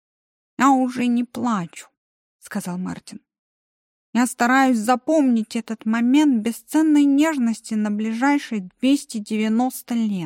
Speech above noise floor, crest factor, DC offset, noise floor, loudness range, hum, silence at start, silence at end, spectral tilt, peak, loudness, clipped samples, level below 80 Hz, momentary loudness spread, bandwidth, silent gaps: over 70 dB; 16 dB; under 0.1%; under -90 dBFS; 8 LU; none; 0.6 s; 0 s; -5 dB/octave; -6 dBFS; -20 LUFS; under 0.1%; -70 dBFS; 12 LU; 16.5 kHz; 1.97-2.39 s, 3.39-4.13 s